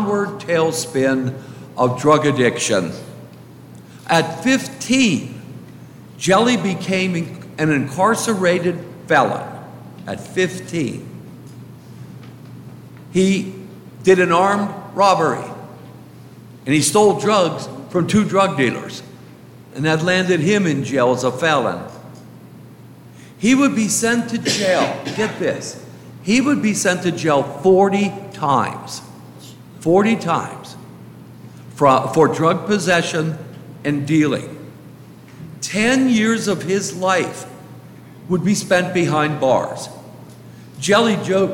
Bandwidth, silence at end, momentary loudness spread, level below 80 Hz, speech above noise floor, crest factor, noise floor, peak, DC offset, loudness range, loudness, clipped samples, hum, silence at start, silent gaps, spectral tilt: 17 kHz; 0 s; 23 LU; -58 dBFS; 24 dB; 18 dB; -41 dBFS; -2 dBFS; under 0.1%; 3 LU; -17 LUFS; under 0.1%; none; 0 s; none; -4.5 dB/octave